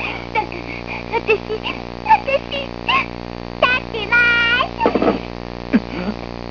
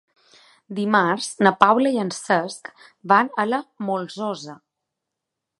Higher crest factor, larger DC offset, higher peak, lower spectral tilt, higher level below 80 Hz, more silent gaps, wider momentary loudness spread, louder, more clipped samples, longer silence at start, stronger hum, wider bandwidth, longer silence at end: about the same, 18 dB vs 22 dB; first, 0.3% vs under 0.1%; about the same, -2 dBFS vs 0 dBFS; about the same, -5.5 dB/octave vs -4.5 dB/octave; first, -38 dBFS vs -70 dBFS; neither; second, 13 LU vs 17 LU; about the same, -18 LUFS vs -20 LUFS; neither; second, 0 s vs 0.7 s; first, 60 Hz at -40 dBFS vs none; second, 5.4 kHz vs 11.5 kHz; second, 0 s vs 1.05 s